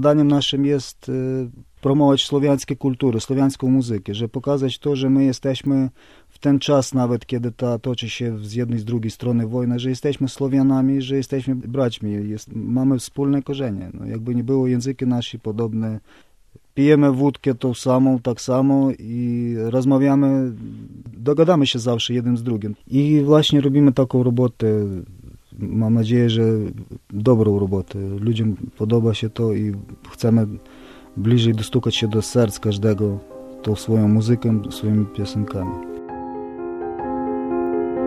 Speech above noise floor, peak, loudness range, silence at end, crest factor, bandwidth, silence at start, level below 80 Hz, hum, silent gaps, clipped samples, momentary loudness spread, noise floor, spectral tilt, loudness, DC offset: 33 dB; -2 dBFS; 4 LU; 0 s; 18 dB; 13.5 kHz; 0 s; -50 dBFS; none; none; under 0.1%; 12 LU; -52 dBFS; -7 dB/octave; -20 LUFS; under 0.1%